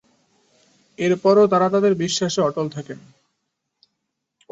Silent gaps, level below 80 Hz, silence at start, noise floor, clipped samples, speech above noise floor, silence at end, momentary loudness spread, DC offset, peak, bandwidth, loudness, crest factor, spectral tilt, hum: none; -66 dBFS; 1 s; -78 dBFS; under 0.1%; 59 dB; 1.55 s; 18 LU; under 0.1%; -4 dBFS; 8 kHz; -19 LUFS; 18 dB; -5 dB/octave; none